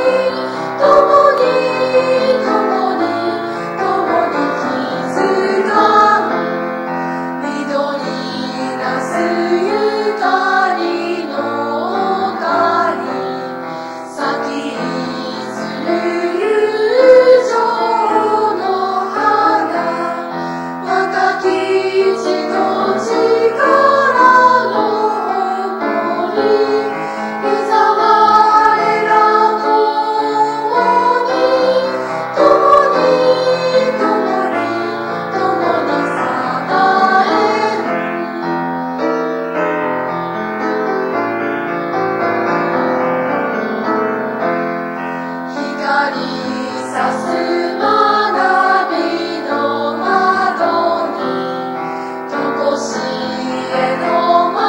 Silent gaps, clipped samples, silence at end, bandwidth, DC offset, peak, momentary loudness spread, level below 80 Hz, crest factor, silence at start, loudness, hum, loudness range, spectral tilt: none; under 0.1%; 0 s; 16.5 kHz; under 0.1%; 0 dBFS; 10 LU; -60 dBFS; 14 dB; 0 s; -14 LUFS; none; 6 LU; -5 dB/octave